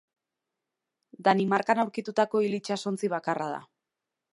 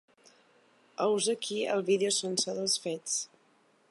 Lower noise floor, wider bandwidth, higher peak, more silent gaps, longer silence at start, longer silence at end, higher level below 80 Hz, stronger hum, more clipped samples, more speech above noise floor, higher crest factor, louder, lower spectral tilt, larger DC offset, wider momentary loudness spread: first, -87 dBFS vs -67 dBFS; about the same, 11.5 kHz vs 11.5 kHz; first, -8 dBFS vs -14 dBFS; neither; first, 1.2 s vs 1 s; about the same, 0.7 s vs 0.65 s; about the same, -80 dBFS vs -84 dBFS; neither; neither; first, 60 dB vs 36 dB; about the same, 20 dB vs 18 dB; about the same, -28 LUFS vs -30 LUFS; first, -5.5 dB/octave vs -2.5 dB/octave; neither; about the same, 7 LU vs 6 LU